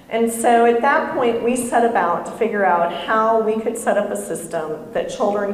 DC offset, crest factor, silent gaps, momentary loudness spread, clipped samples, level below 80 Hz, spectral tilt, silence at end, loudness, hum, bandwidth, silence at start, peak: under 0.1%; 14 dB; none; 10 LU; under 0.1%; -56 dBFS; -4 dB/octave; 0 s; -19 LUFS; none; 15 kHz; 0.1 s; -4 dBFS